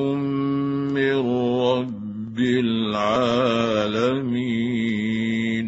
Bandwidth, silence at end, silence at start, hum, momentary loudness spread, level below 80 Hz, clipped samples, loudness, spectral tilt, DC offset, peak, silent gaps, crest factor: 8 kHz; 0 s; 0 s; none; 4 LU; -56 dBFS; under 0.1%; -22 LUFS; -6.5 dB/octave; under 0.1%; -6 dBFS; none; 16 dB